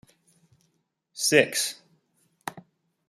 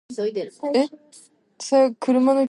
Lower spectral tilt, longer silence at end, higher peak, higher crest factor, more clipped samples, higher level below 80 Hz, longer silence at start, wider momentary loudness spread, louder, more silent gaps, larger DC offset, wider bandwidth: second, -2 dB/octave vs -4.5 dB/octave; first, 0.5 s vs 0.05 s; first, -2 dBFS vs -6 dBFS; first, 28 dB vs 14 dB; neither; about the same, -76 dBFS vs -78 dBFS; first, 1.15 s vs 0.1 s; first, 23 LU vs 10 LU; about the same, -23 LUFS vs -21 LUFS; neither; neither; first, 16 kHz vs 11.5 kHz